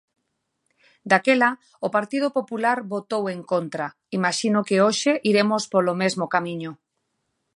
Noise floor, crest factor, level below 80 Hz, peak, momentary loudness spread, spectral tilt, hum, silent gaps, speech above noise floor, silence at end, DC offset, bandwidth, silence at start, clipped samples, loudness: -76 dBFS; 22 dB; -74 dBFS; -2 dBFS; 11 LU; -4.5 dB/octave; none; none; 54 dB; 0.8 s; under 0.1%; 11.5 kHz; 1.05 s; under 0.1%; -22 LUFS